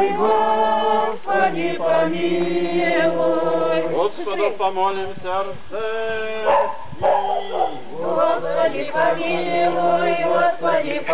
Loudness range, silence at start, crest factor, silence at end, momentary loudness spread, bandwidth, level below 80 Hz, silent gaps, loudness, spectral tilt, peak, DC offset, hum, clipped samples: 3 LU; 0 s; 12 dB; 0 s; 7 LU; 4 kHz; -58 dBFS; none; -20 LUFS; -9 dB/octave; -8 dBFS; 4%; none; under 0.1%